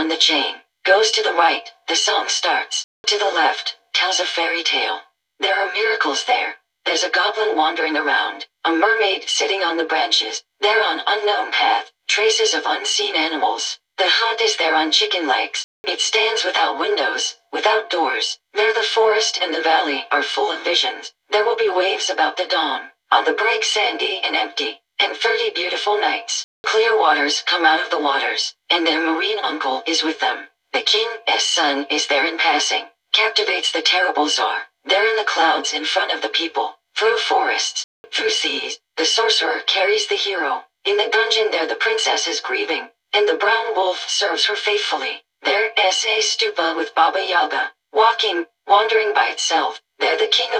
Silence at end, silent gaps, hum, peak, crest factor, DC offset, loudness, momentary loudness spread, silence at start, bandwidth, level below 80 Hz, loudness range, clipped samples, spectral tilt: 0 s; 2.84-3.04 s, 15.64-15.84 s, 26.44-26.64 s, 37.84-38.04 s; none; -2 dBFS; 18 dB; under 0.1%; -18 LUFS; 7 LU; 0 s; 10.5 kHz; -74 dBFS; 2 LU; under 0.1%; 1 dB/octave